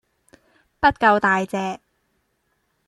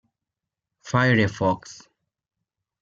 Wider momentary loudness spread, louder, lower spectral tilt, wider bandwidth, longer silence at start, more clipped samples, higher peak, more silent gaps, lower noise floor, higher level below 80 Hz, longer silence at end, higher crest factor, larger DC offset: about the same, 13 LU vs 12 LU; first, -19 LUFS vs -22 LUFS; about the same, -5.5 dB/octave vs -6 dB/octave; first, 12 kHz vs 7.6 kHz; about the same, 0.8 s vs 0.85 s; neither; about the same, -4 dBFS vs -6 dBFS; neither; second, -70 dBFS vs -86 dBFS; first, -52 dBFS vs -60 dBFS; about the same, 1.1 s vs 1.05 s; about the same, 20 dB vs 20 dB; neither